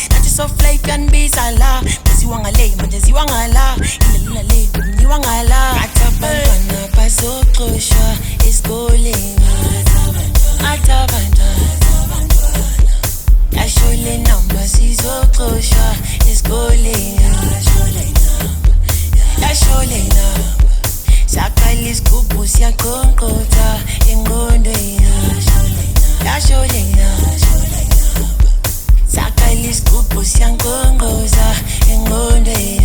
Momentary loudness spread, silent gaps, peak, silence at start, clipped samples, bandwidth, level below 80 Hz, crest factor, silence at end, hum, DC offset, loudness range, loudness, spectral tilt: 2 LU; none; 0 dBFS; 0 s; under 0.1%; 20 kHz; -10 dBFS; 10 dB; 0 s; none; under 0.1%; 1 LU; -13 LUFS; -4 dB/octave